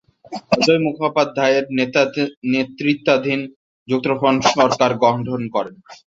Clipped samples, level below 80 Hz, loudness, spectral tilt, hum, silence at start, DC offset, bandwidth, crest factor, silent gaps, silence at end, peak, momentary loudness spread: under 0.1%; -58 dBFS; -18 LUFS; -5 dB/octave; none; 0.3 s; under 0.1%; 7.8 kHz; 18 dB; 2.37-2.42 s, 3.56-3.86 s; 0.15 s; 0 dBFS; 9 LU